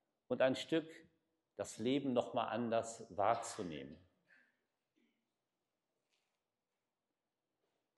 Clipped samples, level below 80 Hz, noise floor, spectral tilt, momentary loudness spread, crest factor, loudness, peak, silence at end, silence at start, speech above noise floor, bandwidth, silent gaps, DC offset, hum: under 0.1%; -82 dBFS; under -90 dBFS; -4.5 dB/octave; 14 LU; 22 dB; -39 LUFS; -20 dBFS; 4 s; 0.3 s; over 51 dB; 12 kHz; none; under 0.1%; none